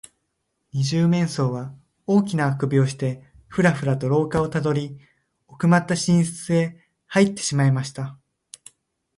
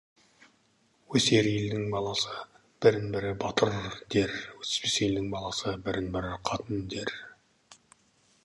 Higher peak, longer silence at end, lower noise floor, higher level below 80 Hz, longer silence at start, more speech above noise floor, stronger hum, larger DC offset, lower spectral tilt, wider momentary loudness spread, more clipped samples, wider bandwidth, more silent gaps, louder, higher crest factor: about the same, -6 dBFS vs -8 dBFS; first, 1.05 s vs 0.7 s; first, -75 dBFS vs -68 dBFS; about the same, -56 dBFS vs -54 dBFS; second, 0.75 s vs 1.1 s; first, 54 dB vs 39 dB; neither; neither; first, -6 dB/octave vs -4.5 dB/octave; about the same, 12 LU vs 11 LU; neither; about the same, 11.5 kHz vs 11.5 kHz; neither; first, -22 LUFS vs -29 LUFS; about the same, 18 dB vs 22 dB